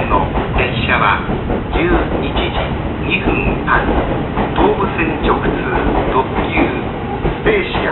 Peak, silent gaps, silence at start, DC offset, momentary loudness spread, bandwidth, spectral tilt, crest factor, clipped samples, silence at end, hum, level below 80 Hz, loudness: -2 dBFS; none; 0 s; under 0.1%; 5 LU; 4.3 kHz; -12 dB/octave; 14 dB; under 0.1%; 0 s; none; -24 dBFS; -16 LUFS